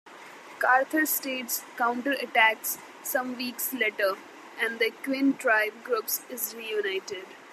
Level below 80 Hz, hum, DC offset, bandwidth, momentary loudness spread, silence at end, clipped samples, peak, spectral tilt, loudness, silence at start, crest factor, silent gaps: -90 dBFS; none; under 0.1%; 15 kHz; 12 LU; 0 s; under 0.1%; -8 dBFS; -1 dB/octave; -27 LUFS; 0.05 s; 22 dB; none